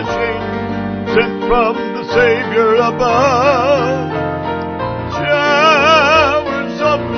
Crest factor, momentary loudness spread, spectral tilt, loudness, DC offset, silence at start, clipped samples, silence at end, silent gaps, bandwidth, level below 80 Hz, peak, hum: 14 dB; 11 LU; -5 dB/octave; -13 LUFS; 0.1%; 0 s; under 0.1%; 0 s; none; 6.6 kHz; -36 dBFS; 0 dBFS; none